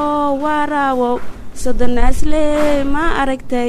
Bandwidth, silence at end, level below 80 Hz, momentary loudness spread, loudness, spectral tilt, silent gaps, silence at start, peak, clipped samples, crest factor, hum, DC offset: 12 kHz; 0 s; -22 dBFS; 8 LU; -17 LUFS; -5.5 dB/octave; none; 0 s; 0 dBFS; under 0.1%; 12 dB; none; under 0.1%